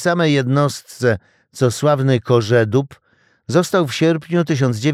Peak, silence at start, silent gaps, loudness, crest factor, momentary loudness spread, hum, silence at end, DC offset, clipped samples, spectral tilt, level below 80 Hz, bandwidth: -2 dBFS; 0 s; none; -17 LUFS; 16 dB; 5 LU; none; 0 s; under 0.1%; under 0.1%; -6 dB/octave; -58 dBFS; 15 kHz